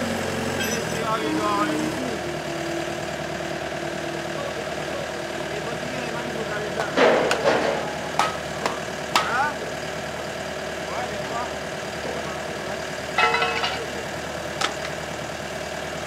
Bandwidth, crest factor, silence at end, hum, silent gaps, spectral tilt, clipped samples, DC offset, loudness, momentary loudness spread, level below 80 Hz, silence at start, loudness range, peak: 16 kHz; 22 dB; 0 s; none; none; -3.5 dB/octave; under 0.1%; under 0.1%; -26 LUFS; 9 LU; -52 dBFS; 0 s; 6 LU; -4 dBFS